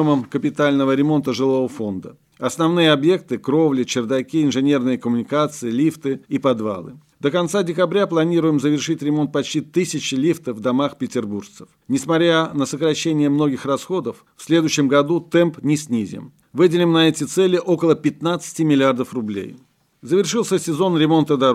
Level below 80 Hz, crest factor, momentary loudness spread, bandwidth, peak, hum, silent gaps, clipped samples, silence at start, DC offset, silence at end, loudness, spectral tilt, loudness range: -66 dBFS; 16 dB; 9 LU; 14.5 kHz; -4 dBFS; none; none; under 0.1%; 0 s; under 0.1%; 0 s; -19 LUFS; -5.5 dB/octave; 3 LU